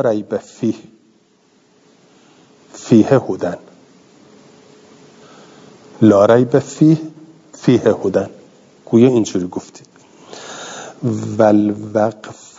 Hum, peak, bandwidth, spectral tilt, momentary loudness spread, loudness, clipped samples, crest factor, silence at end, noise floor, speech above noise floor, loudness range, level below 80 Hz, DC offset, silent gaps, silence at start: none; 0 dBFS; 7.8 kHz; -7 dB/octave; 19 LU; -15 LUFS; under 0.1%; 18 dB; 0.25 s; -55 dBFS; 40 dB; 5 LU; -64 dBFS; under 0.1%; none; 0 s